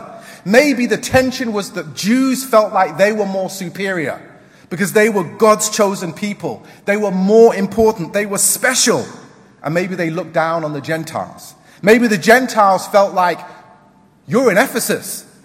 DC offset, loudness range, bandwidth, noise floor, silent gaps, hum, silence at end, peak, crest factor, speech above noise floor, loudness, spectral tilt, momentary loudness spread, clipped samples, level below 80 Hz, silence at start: under 0.1%; 3 LU; 16.5 kHz; -49 dBFS; none; none; 0.25 s; 0 dBFS; 16 dB; 34 dB; -15 LUFS; -4 dB/octave; 14 LU; under 0.1%; -50 dBFS; 0 s